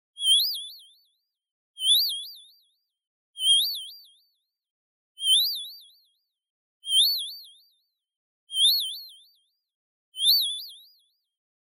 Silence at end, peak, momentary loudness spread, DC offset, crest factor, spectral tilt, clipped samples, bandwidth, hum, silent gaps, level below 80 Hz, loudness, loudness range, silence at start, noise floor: 0.9 s; -10 dBFS; 21 LU; under 0.1%; 20 dB; 11.5 dB/octave; under 0.1%; 16 kHz; none; 1.51-1.74 s, 3.07-3.34 s, 4.71-5.15 s, 6.50-6.80 s, 8.16-8.47 s, 9.75-10.12 s; under -90 dBFS; -22 LUFS; 3 LU; 0.2 s; -73 dBFS